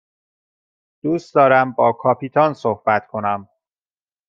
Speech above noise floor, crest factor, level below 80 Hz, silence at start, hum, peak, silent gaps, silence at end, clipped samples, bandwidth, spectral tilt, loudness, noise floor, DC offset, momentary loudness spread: over 73 dB; 18 dB; -68 dBFS; 1.05 s; none; -2 dBFS; none; 0.85 s; under 0.1%; 7.4 kHz; -7.5 dB/octave; -18 LUFS; under -90 dBFS; under 0.1%; 10 LU